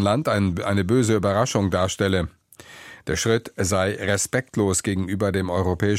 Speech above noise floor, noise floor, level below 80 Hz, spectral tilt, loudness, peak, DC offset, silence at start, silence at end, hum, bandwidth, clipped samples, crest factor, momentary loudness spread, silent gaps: 24 dB; -45 dBFS; -46 dBFS; -5 dB/octave; -22 LUFS; -6 dBFS; under 0.1%; 0 s; 0 s; none; 16 kHz; under 0.1%; 16 dB; 5 LU; none